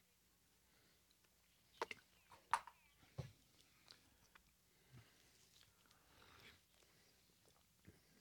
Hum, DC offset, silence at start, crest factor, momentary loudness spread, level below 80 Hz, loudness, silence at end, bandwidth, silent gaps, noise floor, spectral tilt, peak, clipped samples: none; under 0.1%; 1.75 s; 36 dB; 24 LU; -82 dBFS; -50 LUFS; 0 s; 19 kHz; none; -77 dBFS; -3.5 dB/octave; -22 dBFS; under 0.1%